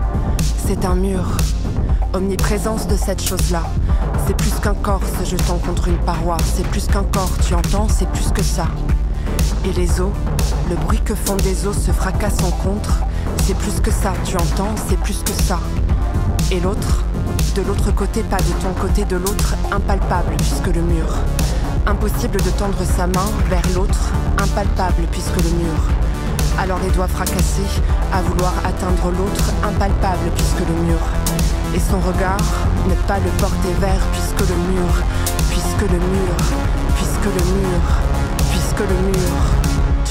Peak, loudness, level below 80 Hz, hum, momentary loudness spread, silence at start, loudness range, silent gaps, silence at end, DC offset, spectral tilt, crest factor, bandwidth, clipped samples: -2 dBFS; -19 LUFS; -18 dBFS; none; 2 LU; 0 s; 1 LU; none; 0 s; under 0.1%; -5.5 dB/octave; 14 dB; 16.5 kHz; under 0.1%